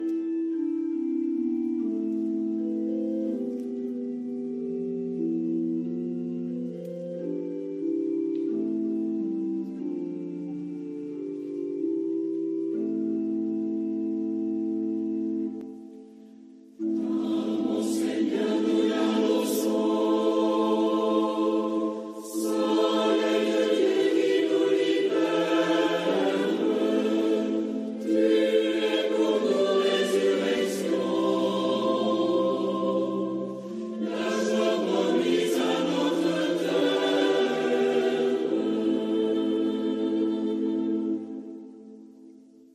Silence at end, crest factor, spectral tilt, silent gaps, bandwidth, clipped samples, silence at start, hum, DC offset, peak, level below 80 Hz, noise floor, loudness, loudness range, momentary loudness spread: 0.35 s; 14 dB; -5 dB/octave; none; 14.5 kHz; under 0.1%; 0 s; none; under 0.1%; -12 dBFS; -78 dBFS; -51 dBFS; -27 LUFS; 7 LU; 9 LU